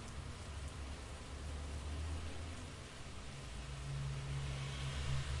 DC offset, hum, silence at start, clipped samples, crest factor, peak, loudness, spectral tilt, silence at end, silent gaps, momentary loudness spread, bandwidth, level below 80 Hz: under 0.1%; none; 0 s; under 0.1%; 16 dB; -28 dBFS; -46 LUFS; -5 dB/octave; 0 s; none; 8 LU; 11.5 kHz; -50 dBFS